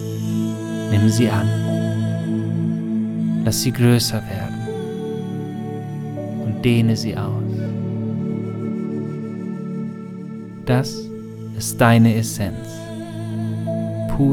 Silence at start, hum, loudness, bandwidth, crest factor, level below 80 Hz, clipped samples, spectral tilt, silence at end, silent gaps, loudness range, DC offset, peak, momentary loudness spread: 0 s; none; -21 LUFS; 17 kHz; 18 dB; -44 dBFS; under 0.1%; -6 dB/octave; 0 s; none; 6 LU; under 0.1%; -2 dBFS; 13 LU